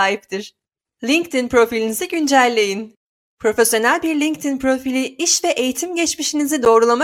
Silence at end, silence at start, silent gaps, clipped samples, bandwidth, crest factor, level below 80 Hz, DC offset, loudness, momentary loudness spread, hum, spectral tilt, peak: 0 s; 0 s; 2.96-3.37 s; under 0.1%; 17 kHz; 16 dB; -54 dBFS; under 0.1%; -17 LUFS; 10 LU; none; -2 dB/octave; -2 dBFS